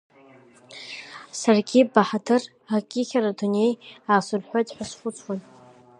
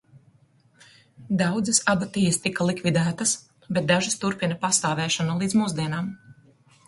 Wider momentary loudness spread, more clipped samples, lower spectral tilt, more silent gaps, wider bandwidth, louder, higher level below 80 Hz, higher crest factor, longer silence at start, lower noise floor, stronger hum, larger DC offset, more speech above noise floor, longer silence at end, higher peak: first, 18 LU vs 8 LU; neither; about the same, -5 dB/octave vs -4 dB/octave; neither; about the same, 11 kHz vs 11.5 kHz; about the same, -24 LUFS vs -24 LUFS; second, -70 dBFS vs -60 dBFS; about the same, 22 dB vs 20 dB; second, 0.7 s vs 1.2 s; second, -52 dBFS vs -60 dBFS; neither; neither; second, 29 dB vs 36 dB; about the same, 0.6 s vs 0.55 s; first, -2 dBFS vs -6 dBFS